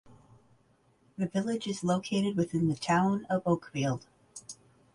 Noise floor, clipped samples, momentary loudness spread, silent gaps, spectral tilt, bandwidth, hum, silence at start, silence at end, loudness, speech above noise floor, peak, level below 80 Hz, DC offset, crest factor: -67 dBFS; under 0.1%; 21 LU; none; -6 dB/octave; 11.5 kHz; none; 0.1 s; 0.4 s; -30 LUFS; 37 dB; -14 dBFS; -64 dBFS; under 0.1%; 18 dB